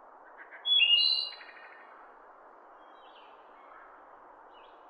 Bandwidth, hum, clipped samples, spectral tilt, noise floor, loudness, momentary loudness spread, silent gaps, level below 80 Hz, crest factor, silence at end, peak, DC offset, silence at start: 9.4 kHz; none; under 0.1%; 1.5 dB/octave; -54 dBFS; -24 LUFS; 29 LU; none; -82 dBFS; 20 dB; 3.25 s; -14 dBFS; under 0.1%; 0.4 s